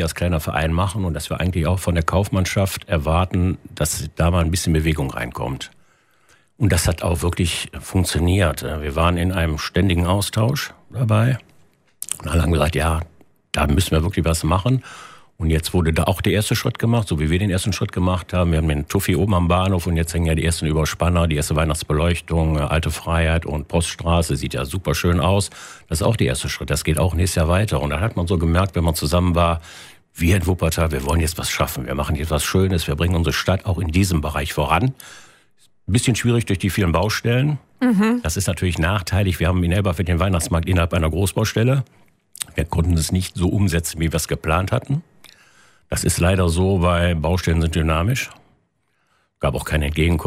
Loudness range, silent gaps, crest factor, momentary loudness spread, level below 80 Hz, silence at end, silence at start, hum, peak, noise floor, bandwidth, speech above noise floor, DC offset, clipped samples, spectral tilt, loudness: 2 LU; none; 20 dB; 6 LU; -30 dBFS; 0 s; 0 s; none; 0 dBFS; -67 dBFS; 16 kHz; 48 dB; under 0.1%; under 0.1%; -5.5 dB/octave; -20 LUFS